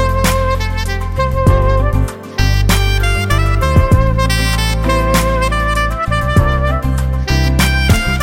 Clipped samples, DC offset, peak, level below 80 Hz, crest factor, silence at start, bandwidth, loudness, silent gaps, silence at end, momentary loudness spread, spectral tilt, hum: under 0.1%; under 0.1%; 0 dBFS; -16 dBFS; 12 dB; 0 s; 17 kHz; -14 LUFS; none; 0 s; 5 LU; -5 dB/octave; none